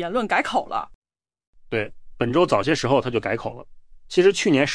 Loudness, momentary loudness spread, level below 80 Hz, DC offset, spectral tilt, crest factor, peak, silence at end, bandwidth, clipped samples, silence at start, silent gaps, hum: -22 LUFS; 12 LU; -50 dBFS; under 0.1%; -5 dB/octave; 16 dB; -6 dBFS; 0 s; 10.5 kHz; under 0.1%; 0 s; 0.95-1.02 s, 1.47-1.53 s; none